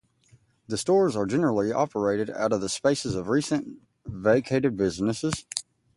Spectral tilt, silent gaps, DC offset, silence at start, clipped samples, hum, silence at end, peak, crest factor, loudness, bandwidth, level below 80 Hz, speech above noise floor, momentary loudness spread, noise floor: -5 dB/octave; none; under 0.1%; 0.7 s; under 0.1%; none; 0.35 s; -4 dBFS; 22 dB; -26 LUFS; 11.5 kHz; -56 dBFS; 36 dB; 11 LU; -61 dBFS